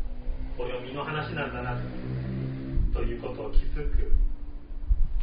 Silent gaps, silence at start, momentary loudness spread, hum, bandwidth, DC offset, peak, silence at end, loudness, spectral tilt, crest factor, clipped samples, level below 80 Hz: none; 0 s; 8 LU; none; 5 kHz; 0.1%; -8 dBFS; 0 s; -33 LUFS; -6 dB/octave; 18 dB; under 0.1%; -28 dBFS